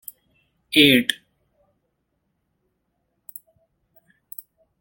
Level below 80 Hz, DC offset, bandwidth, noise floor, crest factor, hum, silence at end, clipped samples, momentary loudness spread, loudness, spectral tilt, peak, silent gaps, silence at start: -62 dBFS; under 0.1%; 17 kHz; -74 dBFS; 26 dB; none; 3.65 s; under 0.1%; 27 LU; -16 LUFS; -3.5 dB/octave; 0 dBFS; none; 0.7 s